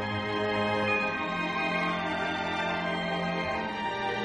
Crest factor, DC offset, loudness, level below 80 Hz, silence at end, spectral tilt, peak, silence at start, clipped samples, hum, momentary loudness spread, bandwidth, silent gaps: 16 dB; under 0.1%; -29 LUFS; -58 dBFS; 0 s; -5.5 dB/octave; -14 dBFS; 0 s; under 0.1%; none; 4 LU; 11 kHz; none